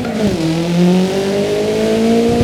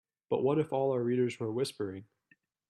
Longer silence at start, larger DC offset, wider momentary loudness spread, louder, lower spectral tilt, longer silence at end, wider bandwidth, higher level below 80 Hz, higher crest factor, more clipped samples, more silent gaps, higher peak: second, 0 s vs 0.3 s; neither; second, 3 LU vs 10 LU; first, -14 LUFS vs -32 LUFS; about the same, -6.5 dB/octave vs -7 dB/octave; second, 0 s vs 0.65 s; first, 15 kHz vs 12.5 kHz; first, -38 dBFS vs -74 dBFS; about the same, 14 dB vs 16 dB; neither; neither; first, 0 dBFS vs -18 dBFS